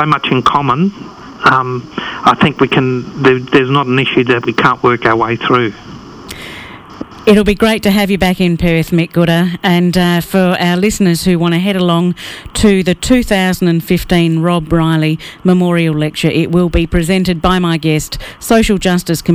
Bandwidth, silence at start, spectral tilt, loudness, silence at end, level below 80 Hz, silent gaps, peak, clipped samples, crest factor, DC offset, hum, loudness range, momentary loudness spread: 16 kHz; 0 s; -6 dB/octave; -12 LUFS; 0 s; -30 dBFS; none; 0 dBFS; under 0.1%; 12 dB; under 0.1%; none; 2 LU; 10 LU